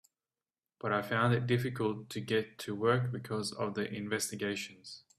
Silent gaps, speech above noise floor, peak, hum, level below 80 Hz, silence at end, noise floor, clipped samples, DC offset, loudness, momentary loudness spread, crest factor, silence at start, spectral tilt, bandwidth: none; over 56 dB; -16 dBFS; none; -70 dBFS; 0.2 s; under -90 dBFS; under 0.1%; under 0.1%; -34 LUFS; 11 LU; 20 dB; 0.85 s; -5 dB/octave; 15 kHz